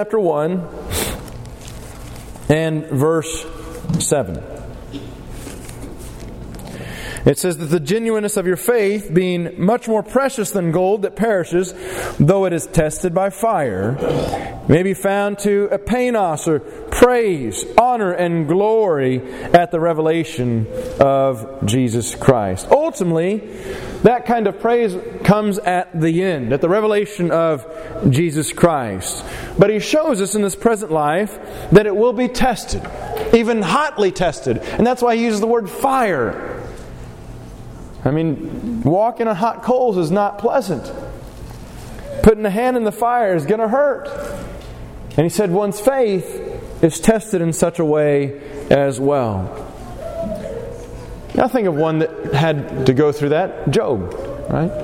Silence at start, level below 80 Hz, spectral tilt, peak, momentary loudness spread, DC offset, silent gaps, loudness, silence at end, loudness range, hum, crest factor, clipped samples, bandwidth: 0 s; -38 dBFS; -6 dB/octave; 0 dBFS; 17 LU; under 0.1%; none; -17 LUFS; 0 s; 5 LU; none; 18 dB; under 0.1%; 16.5 kHz